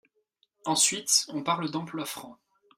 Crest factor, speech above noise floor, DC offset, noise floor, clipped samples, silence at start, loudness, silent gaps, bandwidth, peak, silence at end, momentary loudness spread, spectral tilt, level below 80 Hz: 22 dB; 44 dB; under 0.1%; -73 dBFS; under 0.1%; 0.65 s; -26 LUFS; none; 16 kHz; -8 dBFS; 0.45 s; 14 LU; -1.5 dB/octave; -76 dBFS